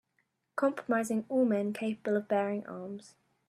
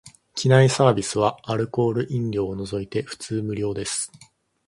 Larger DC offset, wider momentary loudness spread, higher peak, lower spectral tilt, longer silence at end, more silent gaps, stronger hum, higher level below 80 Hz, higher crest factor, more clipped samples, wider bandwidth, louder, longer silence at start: neither; about the same, 13 LU vs 12 LU; second, -16 dBFS vs -2 dBFS; about the same, -6.5 dB/octave vs -5.5 dB/octave; second, 0.4 s vs 0.6 s; neither; neither; second, -82 dBFS vs -54 dBFS; about the same, 18 dB vs 20 dB; neither; first, 13.5 kHz vs 11.5 kHz; second, -32 LUFS vs -23 LUFS; first, 0.55 s vs 0.05 s